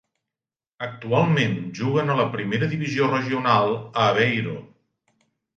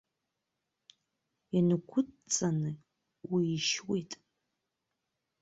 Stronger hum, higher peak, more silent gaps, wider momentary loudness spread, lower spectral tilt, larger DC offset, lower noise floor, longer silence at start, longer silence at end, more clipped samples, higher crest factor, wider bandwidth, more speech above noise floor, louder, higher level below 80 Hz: neither; first, -6 dBFS vs -16 dBFS; neither; second, 13 LU vs 18 LU; first, -6.5 dB/octave vs -4.5 dB/octave; neither; first, under -90 dBFS vs -86 dBFS; second, 0.8 s vs 1.55 s; second, 0.9 s vs 1.3 s; neither; about the same, 18 dB vs 20 dB; about the same, 7.6 kHz vs 8.2 kHz; first, over 68 dB vs 54 dB; first, -22 LUFS vs -32 LUFS; first, -62 dBFS vs -74 dBFS